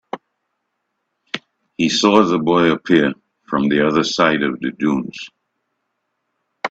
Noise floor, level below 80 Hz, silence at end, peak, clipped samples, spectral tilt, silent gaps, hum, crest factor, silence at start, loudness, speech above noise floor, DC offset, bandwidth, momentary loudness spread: -74 dBFS; -56 dBFS; 0 s; 0 dBFS; under 0.1%; -5 dB/octave; none; none; 18 dB; 0.15 s; -16 LUFS; 58 dB; under 0.1%; 8 kHz; 20 LU